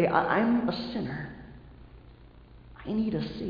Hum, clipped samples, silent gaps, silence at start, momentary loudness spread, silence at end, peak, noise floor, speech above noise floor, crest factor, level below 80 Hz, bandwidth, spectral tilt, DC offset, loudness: none; under 0.1%; none; 0 s; 22 LU; 0 s; -10 dBFS; -52 dBFS; 24 dB; 22 dB; -52 dBFS; 5.2 kHz; -8.5 dB/octave; under 0.1%; -29 LUFS